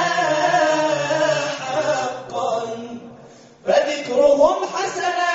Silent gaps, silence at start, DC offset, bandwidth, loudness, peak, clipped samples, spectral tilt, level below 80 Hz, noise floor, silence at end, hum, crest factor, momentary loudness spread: none; 0 s; under 0.1%; 8 kHz; -19 LUFS; -4 dBFS; under 0.1%; -2 dB/octave; -58 dBFS; -44 dBFS; 0 s; none; 16 dB; 11 LU